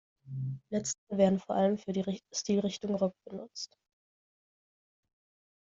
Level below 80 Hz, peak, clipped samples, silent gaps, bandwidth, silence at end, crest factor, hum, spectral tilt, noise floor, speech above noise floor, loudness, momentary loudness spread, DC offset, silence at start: -72 dBFS; -12 dBFS; under 0.1%; 0.98-1.07 s; 7.8 kHz; 1.95 s; 22 dB; none; -5.5 dB/octave; under -90 dBFS; over 58 dB; -32 LUFS; 15 LU; under 0.1%; 0.25 s